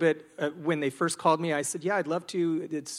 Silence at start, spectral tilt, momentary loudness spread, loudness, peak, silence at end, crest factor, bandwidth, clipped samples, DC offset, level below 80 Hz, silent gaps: 0 s; -4.5 dB/octave; 6 LU; -29 LUFS; -8 dBFS; 0 s; 20 dB; 15.5 kHz; under 0.1%; under 0.1%; -76 dBFS; none